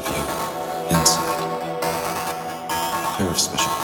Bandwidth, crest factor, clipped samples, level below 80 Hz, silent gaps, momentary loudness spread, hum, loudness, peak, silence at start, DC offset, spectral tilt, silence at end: over 20 kHz; 20 dB; under 0.1%; -46 dBFS; none; 9 LU; none; -22 LUFS; -2 dBFS; 0 s; under 0.1%; -3 dB/octave; 0 s